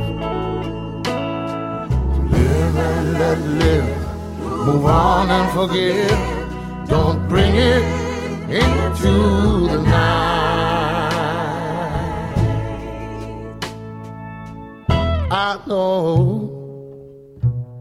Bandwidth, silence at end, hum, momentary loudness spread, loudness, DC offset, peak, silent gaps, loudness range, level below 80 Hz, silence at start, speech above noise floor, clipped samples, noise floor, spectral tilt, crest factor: 15 kHz; 0 s; none; 14 LU; -18 LUFS; under 0.1%; -2 dBFS; none; 7 LU; -28 dBFS; 0 s; 24 dB; under 0.1%; -39 dBFS; -6.5 dB/octave; 16 dB